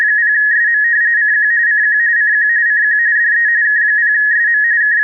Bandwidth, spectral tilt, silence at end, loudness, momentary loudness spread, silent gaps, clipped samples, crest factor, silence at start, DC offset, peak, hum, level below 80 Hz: 2.2 kHz; 6.5 dB/octave; 0 s; -10 LUFS; 0 LU; none; under 0.1%; 4 dB; 0 s; under 0.1%; -8 dBFS; none; under -90 dBFS